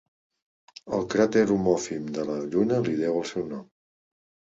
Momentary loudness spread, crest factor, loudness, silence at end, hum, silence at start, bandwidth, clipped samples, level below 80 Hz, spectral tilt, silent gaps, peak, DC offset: 11 LU; 18 dB; -26 LUFS; 0.9 s; none; 0.85 s; 8 kHz; under 0.1%; -60 dBFS; -6 dB/octave; none; -8 dBFS; under 0.1%